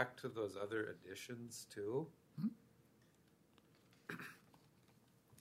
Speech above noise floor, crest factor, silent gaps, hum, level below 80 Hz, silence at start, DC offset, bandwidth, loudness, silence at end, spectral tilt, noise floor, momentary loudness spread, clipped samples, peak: 27 dB; 26 dB; none; none; -86 dBFS; 0 s; under 0.1%; 16 kHz; -47 LUFS; 0 s; -5 dB/octave; -72 dBFS; 11 LU; under 0.1%; -22 dBFS